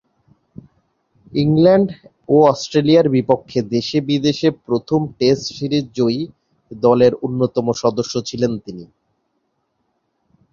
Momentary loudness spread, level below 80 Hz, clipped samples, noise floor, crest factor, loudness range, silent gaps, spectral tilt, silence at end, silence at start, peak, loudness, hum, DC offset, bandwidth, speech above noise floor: 10 LU; -54 dBFS; under 0.1%; -69 dBFS; 18 dB; 4 LU; none; -6.5 dB/octave; 1.65 s; 1.3 s; 0 dBFS; -17 LUFS; none; under 0.1%; 7.4 kHz; 53 dB